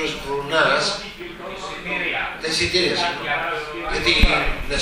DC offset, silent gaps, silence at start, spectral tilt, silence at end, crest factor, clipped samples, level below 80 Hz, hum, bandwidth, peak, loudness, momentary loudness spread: under 0.1%; none; 0 s; -3 dB/octave; 0 s; 22 dB; under 0.1%; -30 dBFS; none; 16 kHz; 0 dBFS; -20 LUFS; 14 LU